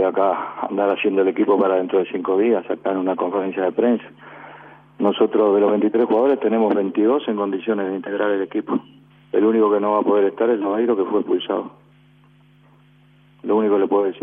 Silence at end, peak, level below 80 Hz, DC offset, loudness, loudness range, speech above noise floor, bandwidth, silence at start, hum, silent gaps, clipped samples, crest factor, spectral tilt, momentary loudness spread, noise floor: 0 s; -4 dBFS; -70 dBFS; under 0.1%; -19 LUFS; 4 LU; 34 dB; 3.7 kHz; 0 s; 50 Hz at -50 dBFS; none; under 0.1%; 16 dB; -9.5 dB/octave; 8 LU; -52 dBFS